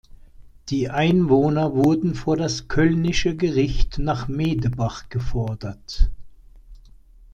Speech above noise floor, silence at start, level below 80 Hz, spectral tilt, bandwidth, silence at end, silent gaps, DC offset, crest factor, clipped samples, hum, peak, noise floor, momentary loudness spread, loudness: 27 dB; 0.4 s; -30 dBFS; -6.5 dB/octave; 8.6 kHz; 0.6 s; none; under 0.1%; 18 dB; under 0.1%; none; -4 dBFS; -47 dBFS; 10 LU; -22 LUFS